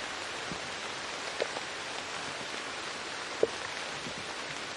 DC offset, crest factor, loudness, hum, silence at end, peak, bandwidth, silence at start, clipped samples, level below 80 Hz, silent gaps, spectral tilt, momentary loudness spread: under 0.1%; 26 dB; -36 LUFS; none; 0 s; -10 dBFS; 11.5 kHz; 0 s; under 0.1%; -68 dBFS; none; -2 dB/octave; 5 LU